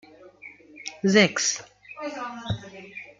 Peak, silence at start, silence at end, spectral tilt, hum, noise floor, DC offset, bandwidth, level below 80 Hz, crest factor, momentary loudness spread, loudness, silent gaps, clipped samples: -4 dBFS; 0.2 s; 0.15 s; -3.5 dB/octave; 50 Hz at -50 dBFS; -48 dBFS; under 0.1%; 9.4 kHz; -58 dBFS; 24 dB; 26 LU; -24 LUFS; none; under 0.1%